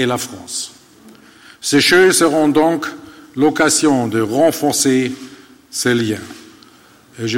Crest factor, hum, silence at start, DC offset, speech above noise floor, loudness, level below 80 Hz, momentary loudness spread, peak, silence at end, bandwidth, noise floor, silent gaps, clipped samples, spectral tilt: 14 dB; none; 0 s; under 0.1%; 32 dB; -15 LUFS; -56 dBFS; 16 LU; -2 dBFS; 0 s; 16.5 kHz; -46 dBFS; none; under 0.1%; -3.5 dB/octave